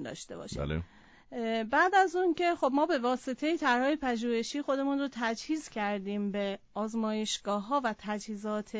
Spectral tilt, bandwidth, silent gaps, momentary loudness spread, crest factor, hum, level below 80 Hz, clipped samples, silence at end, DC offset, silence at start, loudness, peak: -4.5 dB/octave; 8 kHz; none; 10 LU; 18 dB; none; -56 dBFS; under 0.1%; 0 s; under 0.1%; 0 s; -31 LUFS; -14 dBFS